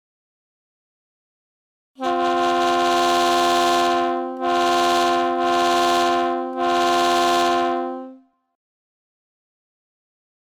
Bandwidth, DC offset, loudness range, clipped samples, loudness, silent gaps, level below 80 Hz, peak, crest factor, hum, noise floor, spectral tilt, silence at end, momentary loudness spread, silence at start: 19 kHz; under 0.1%; 5 LU; under 0.1%; -19 LUFS; none; -60 dBFS; -8 dBFS; 14 dB; none; -45 dBFS; -2.5 dB/octave; 2.4 s; 6 LU; 2 s